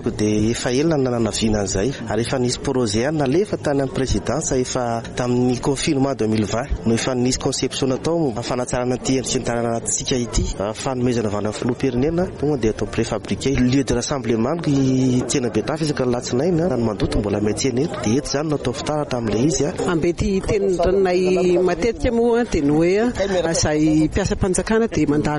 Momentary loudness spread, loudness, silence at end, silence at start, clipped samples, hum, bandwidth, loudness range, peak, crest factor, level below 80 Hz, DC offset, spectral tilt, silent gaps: 5 LU; -20 LUFS; 0 s; 0 s; under 0.1%; none; 11.5 kHz; 3 LU; -6 dBFS; 12 dB; -34 dBFS; under 0.1%; -5 dB/octave; none